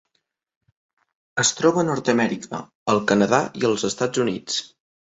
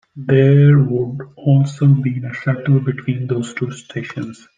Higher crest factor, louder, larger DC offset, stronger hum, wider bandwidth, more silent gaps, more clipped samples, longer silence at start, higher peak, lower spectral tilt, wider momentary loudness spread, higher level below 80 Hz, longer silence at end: first, 20 dB vs 14 dB; second, -21 LUFS vs -16 LUFS; neither; neither; about the same, 8.2 kHz vs 7.6 kHz; first, 2.75-2.86 s vs none; neither; first, 1.35 s vs 0.15 s; about the same, -4 dBFS vs -2 dBFS; second, -4 dB/octave vs -8.5 dB/octave; second, 10 LU vs 15 LU; about the same, -62 dBFS vs -58 dBFS; first, 0.4 s vs 0.25 s